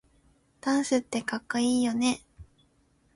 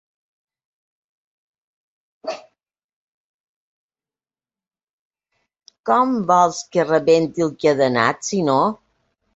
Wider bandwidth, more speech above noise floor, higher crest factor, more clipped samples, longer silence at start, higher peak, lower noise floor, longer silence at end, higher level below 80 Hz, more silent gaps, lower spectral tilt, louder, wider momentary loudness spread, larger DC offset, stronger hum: first, 11.5 kHz vs 8 kHz; second, 40 dB vs over 73 dB; about the same, 18 dB vs 20 dB; neither; second, 0.65 s vs 2.25 s; second, -12 dBFS vs -2 dBFS; second, -66 dBFS vs under -90 dBFS; about the same, 0.7 s vs 0.6 s; about the same, -62 dBFS vs -64 dBFS; second, none vs 2.84-3.89 s, 4.90-5.10 s; second, -3.5 dB/octave vs -5 dB/octave; second, -28 LUFS vs -18 LUFS; second, 7 LU vs 16 LU; neither; neither